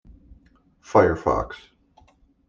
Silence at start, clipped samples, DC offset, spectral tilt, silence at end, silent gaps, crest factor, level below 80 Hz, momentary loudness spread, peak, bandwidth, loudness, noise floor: 0.9 s; under 0.1%; under 0.1%; -7 dB/octave; 0.95 s; none; 22 dB; -46 dBFS; 17 LU; -4 dBFS; 7.4 kHz; -22 LUFS; -58 dBFS